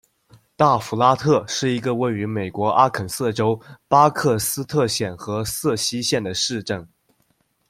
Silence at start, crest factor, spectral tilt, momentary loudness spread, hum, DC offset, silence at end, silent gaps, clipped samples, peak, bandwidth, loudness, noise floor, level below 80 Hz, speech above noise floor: 0.6 s; 20 dB; -4.5 dB/octave; 9 LU; none; under 0.1%; 0.85 s; none; under 0.1%; -2 dBFS; 16.5 kHz; -20 LUFS; -66 dBFS; -56 dBFS; 45 dB